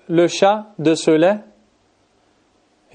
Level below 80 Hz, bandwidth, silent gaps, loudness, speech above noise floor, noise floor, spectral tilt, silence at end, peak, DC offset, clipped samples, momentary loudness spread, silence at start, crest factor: -70 dBFS; 9.8 kHz; none; -17 LUFS; 44 dB; -60 dBFS; -5 dB/octave; 1.55 s; -2 dBFS; under 0.1%; under 0.1%; 5 LU; 0.1 s; 16 dB